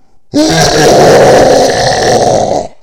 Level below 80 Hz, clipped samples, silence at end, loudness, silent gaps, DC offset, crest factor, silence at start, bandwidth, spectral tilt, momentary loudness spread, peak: -30 dBFS; 4%; 0.15 s; -6 LUFS; none; under 0.1%; 6 dB; 0.35 s; 17.5 kHz; -4 dB/octave; 7 LU; 0 dBFS